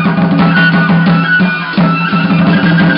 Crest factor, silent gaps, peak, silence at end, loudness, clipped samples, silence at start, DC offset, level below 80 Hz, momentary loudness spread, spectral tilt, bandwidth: 8 dB; none; 0 dBFS; 0 s; -9 LUFS; under 0.1%; 0 s; under 0.1%; -42 dBFS; 3 LU; -12.5 dB/octave; 5.4 kHz